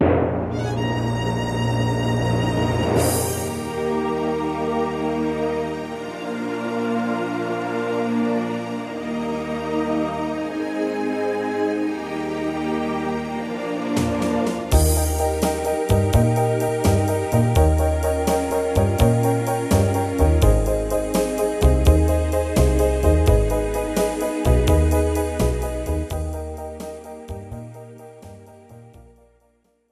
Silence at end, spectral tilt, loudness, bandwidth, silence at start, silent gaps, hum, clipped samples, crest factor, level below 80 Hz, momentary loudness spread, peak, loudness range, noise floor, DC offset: 0.9 s; -6 dB/octave; -21 LUFS; 15 kHz; 0 s; none; none; under 0.1%; 18 dB; -28 dBFS; 10 LU; -2 dBFS; 5 LU; -63 dBFS; under 0.1%